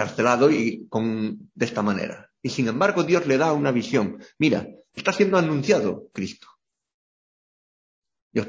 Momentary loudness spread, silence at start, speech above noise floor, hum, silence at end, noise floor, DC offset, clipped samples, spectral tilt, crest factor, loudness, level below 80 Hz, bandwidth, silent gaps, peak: 12 LU; 0 s; over 67 dB; none; 0 s; under -90 dBFS; under 0.1%; under 0.1%; -6 dB/octave; 20 dB; -23 LUFS; -62 dBFS; 7.6 kHz; 6.94-8.02 s, 8.22-8.31 s; -4 dBFS